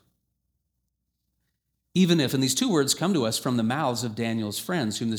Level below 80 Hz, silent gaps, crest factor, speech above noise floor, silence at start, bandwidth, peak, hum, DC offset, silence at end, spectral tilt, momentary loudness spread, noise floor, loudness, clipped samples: -66 dBFS; none; 18 dB; 54 dB; 1.95 s; over 20 kHz; -8 dBFS; none; under 0.1%; 0 s; -4.5 dB/octave; 7 LU; -79 dBFS; -25 LUFS; under 0.1%